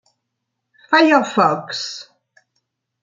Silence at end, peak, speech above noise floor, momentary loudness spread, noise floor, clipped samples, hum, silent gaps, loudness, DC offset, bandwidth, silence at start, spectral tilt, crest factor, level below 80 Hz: 1 s; -2 dBFS; 61 dB; 15 LU; -77 dBFS; under 0.1%; none; none; -16 LUFS; under 0.1%; 7.6 kHz; 0.9 s; -4 dB/octave; 18 dB; -70 dBFS